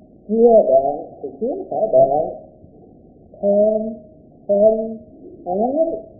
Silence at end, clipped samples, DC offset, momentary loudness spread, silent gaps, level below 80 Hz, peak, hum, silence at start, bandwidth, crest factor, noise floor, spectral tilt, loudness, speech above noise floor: 0.15 s; under 0.1%; under 0.1%; 20 LU; none; -52 dBFS; -2 dBFS; none; 0.3 s; 0.9 kHz; 16 dB; -46 dBFS; -17 dB/octave; -17 LUFS; 29 dB